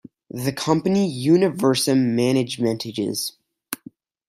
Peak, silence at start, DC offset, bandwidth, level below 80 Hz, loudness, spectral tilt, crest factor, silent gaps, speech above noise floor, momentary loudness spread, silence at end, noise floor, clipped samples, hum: -4 dBFS; 0.35 s; under 0.1%; 16 kHz; -62 dBFS; -21 LUFS; -5.5 dB/octave; 18 dB; none; 27 dB; 15 LU; 0.55 s; -47 dBFS; under 0.1%; none